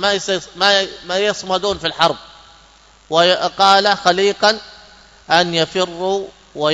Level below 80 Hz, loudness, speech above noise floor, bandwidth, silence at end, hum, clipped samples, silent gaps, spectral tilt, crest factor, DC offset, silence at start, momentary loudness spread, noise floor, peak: -52 dBFS; -16 LUFS; 32 dB; 11 kHz; 0 s; none; under 0.1%; none; -3 dB/octave; 18 dB; under 0.1%; 0 s; 9 LU; -48 dBFS; 0 dBFS